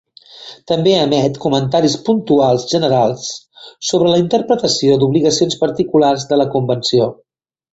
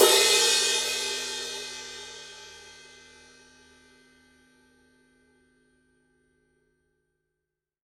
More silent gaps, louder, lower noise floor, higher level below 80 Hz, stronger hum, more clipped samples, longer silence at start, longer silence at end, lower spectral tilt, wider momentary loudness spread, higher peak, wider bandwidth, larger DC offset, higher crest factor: neither; first, -14 LUFS vs -23 LUFS; second, -38 dBFS vs -86 dBFS; first, -52 dBFS vs -68 dBFS; neither; neither; first, 0.35 s vs 0 s; second, 0.6 s vs 5.15 s; first, -5.5 dB/octave vs 1 dB/octave; second, 9 LU vs 27 LU; first, 0 dBFS vs -6 dBFS; second, 8.2 kHz vs 16 kHz; neither; second, 14 dB vs 26 dB